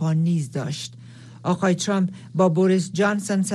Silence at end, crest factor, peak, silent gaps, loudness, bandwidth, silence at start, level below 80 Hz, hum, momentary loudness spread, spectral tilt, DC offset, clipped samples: 0 s; 16 dB; -6 dBFS; none; -22 LUFS; 12.5 kHz; 0 s; -68 dBFS; none; 11 LU; -6 dB/octave; under 0.1%; under 0.1%